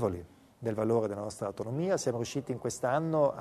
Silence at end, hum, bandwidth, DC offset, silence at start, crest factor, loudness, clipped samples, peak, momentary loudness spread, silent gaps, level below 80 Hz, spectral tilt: 0 s; none; 13.5 kHz; under 0.1%; 0 s; 18 dB; -32 LUFS; under 0.1%; -14 dBFS; 8 LU; none; -66 dBFS; -6 dB/octave